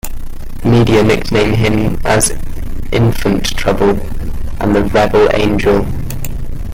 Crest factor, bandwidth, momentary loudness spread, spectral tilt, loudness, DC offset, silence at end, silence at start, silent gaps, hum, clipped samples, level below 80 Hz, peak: 12 dB; 16.5 kHz; 15 LU; -5.5 dB/octave; -13 LUFS; under 0.1%; 0 s; 0.05 s; none; none; under 0.1%; -20 dBFS; 0 dBFS